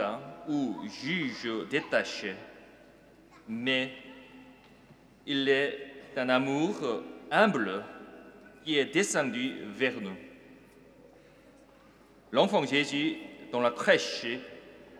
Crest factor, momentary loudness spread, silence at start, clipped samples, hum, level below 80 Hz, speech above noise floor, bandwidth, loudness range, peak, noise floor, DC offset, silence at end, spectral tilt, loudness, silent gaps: 24 dB; 21 LU; 0 s; under 0.1%; none; -72 dBFS; 28 dB; 14.5 kHz; 6 LU; -8 dBFS; -58 dBFS; under 0.1%; 0 s; -4 dB/octave; -30 LUFS; none